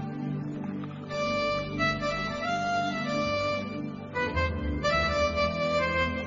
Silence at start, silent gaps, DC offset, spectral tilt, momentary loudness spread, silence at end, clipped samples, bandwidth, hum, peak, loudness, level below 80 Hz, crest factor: 0 s; none; under 0.1%; -5.5 dB/octave; 9 LU; 0 s; under 0.1%; 7.6 kHz; none; -14 dBFS; -29 LUFS; -44 dBFS; 16 dB